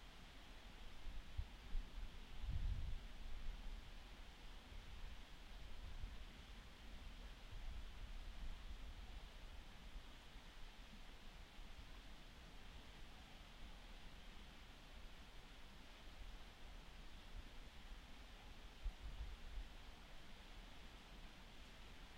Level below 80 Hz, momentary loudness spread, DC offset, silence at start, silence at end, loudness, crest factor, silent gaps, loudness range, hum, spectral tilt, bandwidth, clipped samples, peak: -54 dBFS; 6 LU; under 0.1%; 0 s; 0 s; -58 LUFS; 20 dB; none; 7 LU; none; -4.5 dB/octave; 16 kHz; under 0.1%; -34 dBFS